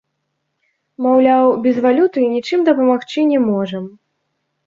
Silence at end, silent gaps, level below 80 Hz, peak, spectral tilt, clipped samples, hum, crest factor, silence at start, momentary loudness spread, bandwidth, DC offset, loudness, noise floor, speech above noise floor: 0.8 s; none; -64 dBFS; -2 dBFS; -7 dB/octave; under 0.1%; none; 14 dB; 1 s; 9 LU; 7.2 kHz; under 0.1%; -15 LUFS; -72 dBFS; 58 dB